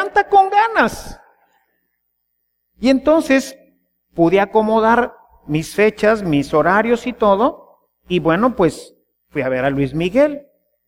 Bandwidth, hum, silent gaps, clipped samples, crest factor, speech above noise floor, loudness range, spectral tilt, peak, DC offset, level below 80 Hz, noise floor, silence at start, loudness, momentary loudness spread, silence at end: 16 kHz; none; none; under 0.1%; 16 dB; 55 dB; 3 LU; -6 dB/octave; -2 dBFS; under 0.1%; -46 dBFS; -71 dBFS; 0 s; -16 LUFS; 10 LU; 0.5 s